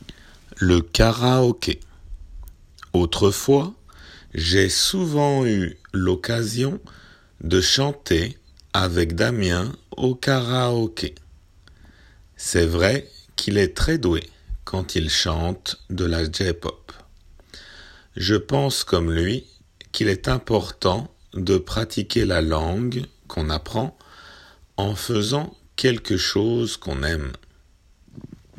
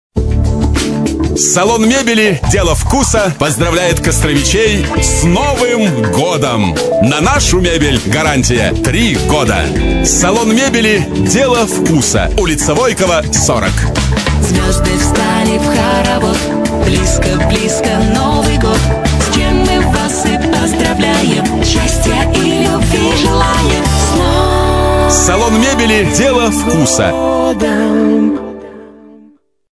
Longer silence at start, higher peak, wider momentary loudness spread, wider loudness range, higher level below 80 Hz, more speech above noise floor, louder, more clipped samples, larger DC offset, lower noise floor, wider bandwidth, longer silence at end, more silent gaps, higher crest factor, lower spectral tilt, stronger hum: about the same, 0.1 s vs 0.15 s; about the same, 0 dBFS vs 0 dBFS; first, 12 LU vs 3 LU; about the same, 4 LU vs 2 LU; second, -38 dBFS vs -20 dBFS; about the same, 34 dB vs 34 dB; second, -22 LUFS vs -11 LUFS; neither; neither; first, -55 dBFS vs -45 dBFS; first, 16 kHz vs 11 kHz; second, 0.35 s vs 0.65 s; neither; first, 22 dB vs 10 dB; about the same, -5 dB/octave vs -4.5 dB/octave; neither